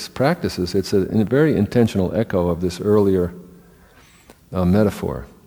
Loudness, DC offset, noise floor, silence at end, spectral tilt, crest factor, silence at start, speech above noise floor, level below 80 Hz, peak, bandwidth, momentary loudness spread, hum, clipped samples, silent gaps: -19 LUFS; under 0.1%; -49 dBFS; 0.2 s; -7 dB/octave; 18 dB; 0 s; 31 dB; -44 dBFS; -2 dBFS; over 20 kHz; 6 LU; none; under 0.1%; none